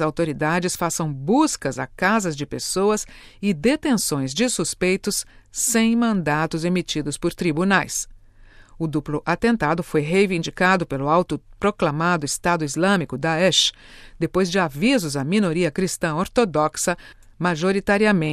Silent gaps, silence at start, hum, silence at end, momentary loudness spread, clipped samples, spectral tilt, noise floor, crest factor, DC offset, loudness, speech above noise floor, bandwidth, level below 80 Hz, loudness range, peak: none; 0 s; none; 0 s; 8 LU; under 0.1%; -4 dB/octave; -47 dBFS; 18 dB; under 0.1%; -21 LUFS; 26 dB; 14.5 kHz; -46 dBFS; 2 LU; -4 dBFS